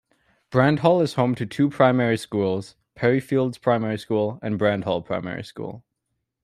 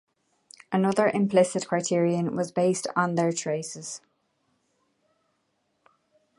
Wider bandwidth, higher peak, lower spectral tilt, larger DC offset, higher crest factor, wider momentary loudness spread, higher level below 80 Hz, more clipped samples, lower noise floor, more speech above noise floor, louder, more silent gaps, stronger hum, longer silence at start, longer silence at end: first, 13.5 kHz vs 11.5 kHz; first, -4 dBFS vs -8 dBFS; first, -7 dB/octave vs -5.5 dB/octave; neither; about the same, 20 dB vs 20 dB; about the same, 12 LU vs 11 LU; first, -60 dBFS vs -74 dBFS; neither; first, -78 dBFS vs -74 dBFS; first, 57 dB vs 49 dB; first, -22 LUFS vs -25 LUFS; neither; neither; second, 0.5 s vs 0.7 s; second, 0.65 s vs 2.4 s